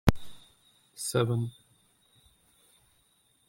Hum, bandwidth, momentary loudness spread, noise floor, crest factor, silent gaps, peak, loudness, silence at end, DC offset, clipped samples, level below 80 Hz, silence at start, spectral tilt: none; 16.5 kHz; 24 LU; -68 dBFS; 30 dB; none; -2 dBFS; -31 LUFS; 2 s; under 0.1%; under 0.1%; -44 dBFS; 0.05 s; -5.5 dB/octave